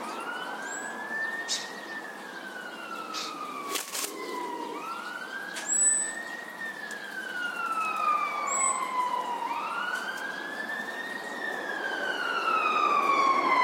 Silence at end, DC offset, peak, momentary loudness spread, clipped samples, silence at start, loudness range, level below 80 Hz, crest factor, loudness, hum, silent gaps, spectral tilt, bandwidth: 0 s; under 0.1%; -14 dBFS; 13 LU; under 0.1%; 0 s; 7 LU; -88 dBFS; 18 dB; -30 LUFS; none; none; 0 dB/octave; 16.5 kHz